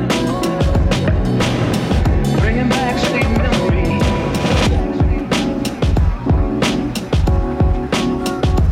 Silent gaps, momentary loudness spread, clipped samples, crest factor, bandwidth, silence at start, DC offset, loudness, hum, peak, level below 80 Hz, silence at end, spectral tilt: none; 3 LU; under 0.1%; 12 dB; 16 kHz; 0 s; under 0.1%; -17 LUFS; none; -4 dBFS; -20 dBFS; 0 s; -6 dB/octave